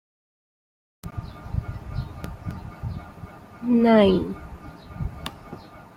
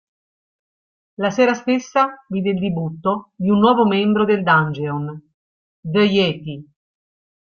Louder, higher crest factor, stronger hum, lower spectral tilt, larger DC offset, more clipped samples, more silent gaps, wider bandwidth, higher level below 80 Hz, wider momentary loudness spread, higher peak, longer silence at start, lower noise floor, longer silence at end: second, -24 LUFS vs -18 LUFS; about the same, 22 dB vs 18 dB; neither; first, -8 dB/octave vs -6.5 dB/octave; neither; neither; second, none vs 5.34-5.83 s; first, 15 kHz vs 6.8 kHz; first, -42 dBFS vs -58 dBFS; first, 25 LU vs 12 LU; about the same, -4 dBFS vs -2 dBFS; second, 1.05 s vs 1.2 s; second, -42 dBFS vs under -90 dBFS; second, 0.1 s vs 0.8 s